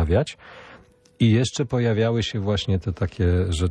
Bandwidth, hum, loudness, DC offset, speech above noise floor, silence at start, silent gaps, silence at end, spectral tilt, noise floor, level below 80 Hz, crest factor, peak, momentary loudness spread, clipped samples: 10 kHz; none; -23 LUFS; under 0.1%; 29 dB; 0 s; none; 0 s; -6.5 dB/octave; -50 dBFS; -38 dBFS; 16 dB; -6 dBFS; 8 LU; under 0.1%